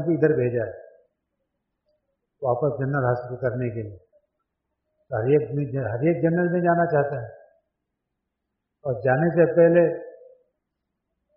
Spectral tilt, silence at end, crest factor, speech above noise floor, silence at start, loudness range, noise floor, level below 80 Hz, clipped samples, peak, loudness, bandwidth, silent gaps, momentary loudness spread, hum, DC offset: -9.5 dB/octave; 1.25 s; 18 dB; 59 dB; 0 s; 5 LU; -81 dBFS; -62 dBFS; under 0.1%; -6 dBFS; -23 LUFS; 3.2 kHz; none; 16 LU; none; under 0.1%